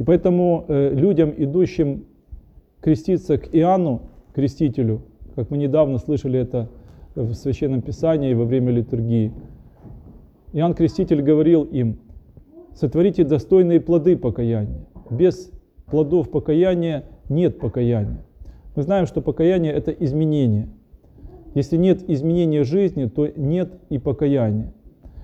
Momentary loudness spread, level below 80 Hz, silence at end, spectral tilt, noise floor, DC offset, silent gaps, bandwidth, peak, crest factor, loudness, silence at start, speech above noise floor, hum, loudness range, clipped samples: 11 LU; -42 dBFS; 0 s; -9.5 dB/octave; -45 dBFS; under 0.1%; none; 8 kHz; -4 dBFS; 14 dB; -20 LUFS; 0 s; 26 dB; none; 3 LU; under 0.1%